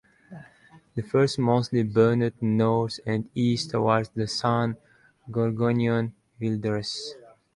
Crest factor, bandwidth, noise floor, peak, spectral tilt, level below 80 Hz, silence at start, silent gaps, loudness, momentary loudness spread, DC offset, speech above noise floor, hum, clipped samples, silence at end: 18 dB; 11.5 kHz; -55 dBFS; -8 dBFS; -6.5 dB/octave; -60 dBFS; 0.3 s; none; -25 LUFS; 11 LU; under 0.1%; 31 dB; none; under 0.1%; 0.4 s